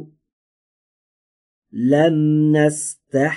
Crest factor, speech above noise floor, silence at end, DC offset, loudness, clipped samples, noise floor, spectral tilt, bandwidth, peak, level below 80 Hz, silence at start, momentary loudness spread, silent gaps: 16 dB; over 74 dB; 0 s; under 0.1%; -17 LUFS; under 0.1%; under -90 dBFS; -6 dB/octave; 11.5 kHz; -4 dBFS; -66 dBFS; 0 s; 9 LU; 0.33-1.62 s